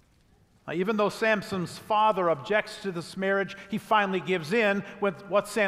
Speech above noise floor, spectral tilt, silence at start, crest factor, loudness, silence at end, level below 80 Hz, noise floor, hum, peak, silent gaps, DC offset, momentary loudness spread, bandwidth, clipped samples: 35 dB; -5 dB/octave; 0.65 s; 18 dB; -27 LUFS; 0 s; -66 dBFS; -62 dBFS; none; -10 dBFS; none; under 0.1%; 10 LU; 15.5 kHz; under 0.1%